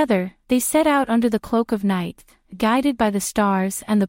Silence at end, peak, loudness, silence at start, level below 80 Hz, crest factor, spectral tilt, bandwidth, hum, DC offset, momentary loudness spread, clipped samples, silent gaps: 0 s; -6 dBFS; -20 LUFS; 0 s; -50 dBFS; 14 dB; -5 dB/octave; 16.5 kHz; none; under 0.1%; 5 LU; under 0.1%; none